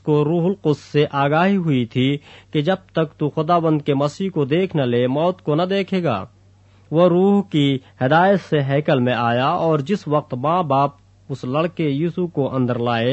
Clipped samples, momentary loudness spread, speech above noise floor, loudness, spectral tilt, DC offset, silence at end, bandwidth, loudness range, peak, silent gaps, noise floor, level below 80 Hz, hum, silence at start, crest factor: under 0.1%; 6 LU; 32 dB; -19 LUFS; -8 dB/octave; under 0.1%; 0 s; 8.4 kHz; 3 LU; -2 dBFS; none; -51 dBFS; -58 dBFS; none; 0.05 s; 16 dB